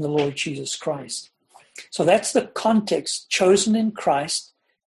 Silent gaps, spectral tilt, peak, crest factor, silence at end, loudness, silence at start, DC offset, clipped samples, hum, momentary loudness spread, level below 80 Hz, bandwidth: none; -4 dB/octave; -4 dBFS; 18 dB; 0.45 s; -22 LUFS; 0 s; under 0.1%; under 0.1%; none; 12 LU; -62 dBFS; 12.5 kHz